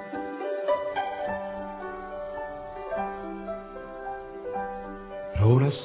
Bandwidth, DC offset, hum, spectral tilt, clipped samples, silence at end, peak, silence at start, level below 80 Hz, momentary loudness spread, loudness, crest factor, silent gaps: 4 kHz; under 0.1%; none; -11.5 dB/octave; under 0.1%; 0 s; -10 dBFS; 0 s; -48 dBFS; 14 LU; -31 LUFS; 20 dB; none